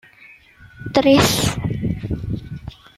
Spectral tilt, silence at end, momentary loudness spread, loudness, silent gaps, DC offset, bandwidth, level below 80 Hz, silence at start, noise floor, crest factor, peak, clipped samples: -5 dB/octave; 0.25 s; 21 LU; -19 LUFS; none; under 0.1%; 15.5 kHz; -38 dBFS; 0.3 s; -47 dBFS; 18 dB; -2 dBFS; under 0.1%